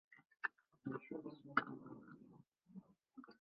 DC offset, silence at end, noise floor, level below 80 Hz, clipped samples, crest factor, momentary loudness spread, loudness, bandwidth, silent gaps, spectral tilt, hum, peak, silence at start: under 0.1%; 0.05 s; -67 dBFS; -88 dBFS; under 0.1%; 32 dB; 21 LU; -47 LUFS; 5 kHz; none; -3.5 dB/octave; none; -18 dBFS; 0.1 s